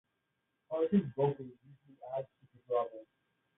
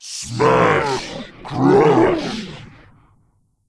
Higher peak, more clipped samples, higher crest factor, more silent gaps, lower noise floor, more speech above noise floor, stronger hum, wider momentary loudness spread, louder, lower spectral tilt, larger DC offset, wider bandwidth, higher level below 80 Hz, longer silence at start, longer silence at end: second, -18 dBFS vs 0 dBFS; neither; about the same, 18 dB vs 18 dB; neither; first, -83 dBFS vs -61 dBFS; first, 49 dB vs 45 dB; neither; about the same, 20 LU vs 19 LU; second, -35 LUFS vs -16 LUFS; first, -7.5 dB/octave vs -5.5 dB/octave; neither; second, 3.9 kHz vs 11 kHz; second, -76 dBFS vs -46 dBFS; first, 0.7 s vs 0 s; second, 0.55 s vs 1 s